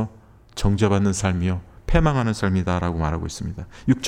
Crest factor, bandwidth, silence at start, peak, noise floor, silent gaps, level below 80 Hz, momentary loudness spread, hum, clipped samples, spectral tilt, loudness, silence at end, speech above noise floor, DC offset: 20 dB; 12.5 kHz; 0 s; -2 dBFS; -47 dBFS; none; -32 dBFS; 12 LU; none; under 0.1%; -6 dB/octave; -23 LUFS; 0 s; 26 dB; under 0.1%